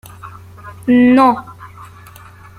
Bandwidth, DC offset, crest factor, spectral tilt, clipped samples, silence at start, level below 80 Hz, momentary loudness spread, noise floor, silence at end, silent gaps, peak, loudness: 14 kHz; under 0.1%; 14 dB; -7 dB/octave; under 0.1%; 0.25 s; -50 dBFS; 26 LU; -39 dBFS; 0.75 s; none; -2 dBFS; -12 LUFS